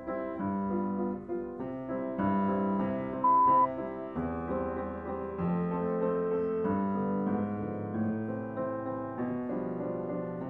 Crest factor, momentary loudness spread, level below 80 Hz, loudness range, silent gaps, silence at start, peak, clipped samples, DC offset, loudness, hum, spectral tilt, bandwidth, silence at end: 14 dB; 10 LU; -58 dBFS; 4 LU; none; 0 s; -16 dBFS; under 0.1%; under 0.1%; -32 LUFS; none; -11.5 dB/octave; 3.9 kHz; 0 s